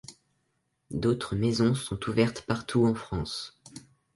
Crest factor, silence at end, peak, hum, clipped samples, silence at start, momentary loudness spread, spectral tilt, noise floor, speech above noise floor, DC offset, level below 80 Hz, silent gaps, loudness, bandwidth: 20 dB; 0.35 s; -10 dBFS; none; under 0.1%; 0.1 s; 16 LU; -6 dB/octave; -76 dBFS; 49 dB; under 0.1%; -50 dBFS; none; -28 LUFS; 11.5 kHz